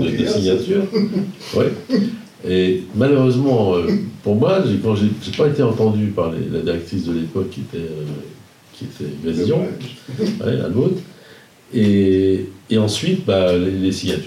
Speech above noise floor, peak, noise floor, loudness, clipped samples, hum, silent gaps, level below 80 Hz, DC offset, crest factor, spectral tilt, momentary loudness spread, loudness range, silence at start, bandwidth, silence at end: 27 dB; -2 dBFS; -45 dBFS; -18 LUFS; under 0.1%; none; none; -54 dBFS; under 0.1%; 16 dB; -7 dB/octave; 12 LU; 7 LU; 0 s; 14 kHz; 0 s